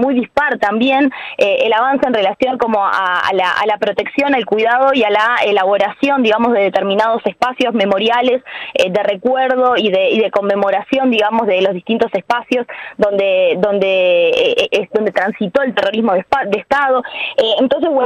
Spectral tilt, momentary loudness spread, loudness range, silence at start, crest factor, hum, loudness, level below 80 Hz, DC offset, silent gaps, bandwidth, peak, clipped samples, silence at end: -5 dB/octave; 4 LU; 2 LU; 0 s; 12 dB; none; -14 LUFS; -54 dBFS; under 0.1%; none; 10.5 kHz; -2 dBFS; under 0.1%; 0 s